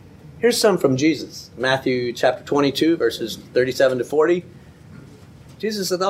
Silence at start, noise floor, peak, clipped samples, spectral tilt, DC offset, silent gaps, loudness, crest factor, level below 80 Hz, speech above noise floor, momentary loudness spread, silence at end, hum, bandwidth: 0.25 s; -43 dBFS; -2 dBFS; under 0.1%; -4.5 dB/octave; under 0.1%; none; -20 LUFS; 18 dB; -56 dBFS; 24 dB; 8 LU; 0 s; none; 16 kHz